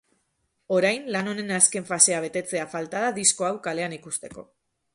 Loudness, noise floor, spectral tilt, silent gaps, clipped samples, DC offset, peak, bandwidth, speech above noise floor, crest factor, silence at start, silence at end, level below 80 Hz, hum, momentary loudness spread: -23 LUFS; -74 dBFS; -2 dB/octave; none; under 0.1%; under 0.1%; -2 dBFS; 11.5 kHz; 49 dB; 24 dB; 0.7 s; 0.5 s; -70 dBFS; none; 12 LU